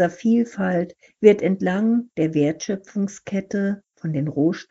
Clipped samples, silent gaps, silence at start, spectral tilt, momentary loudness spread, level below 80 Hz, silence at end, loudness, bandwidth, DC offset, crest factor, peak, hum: under 0.1%; none; 0 s; -7 dB/octave; 11 LU; -64 dBFS; 0.05 s; -22 LUFS; 7.8 kHz; under 0.1%; 20 dB; 0 dBFS; none